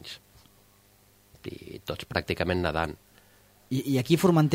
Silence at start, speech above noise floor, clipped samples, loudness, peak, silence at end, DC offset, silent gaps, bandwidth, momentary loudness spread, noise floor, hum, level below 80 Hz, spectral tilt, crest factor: 0.05 s; 35 dB; under 0.1%; -28 LUFS; -8 dBFS; 0 s; under 0.1%; none; 16 kHz; 21 LU; -60 dBFS; 50 Hz at -60 dBFS; -52 dBFS; -6.5 dB/octave; 22 dB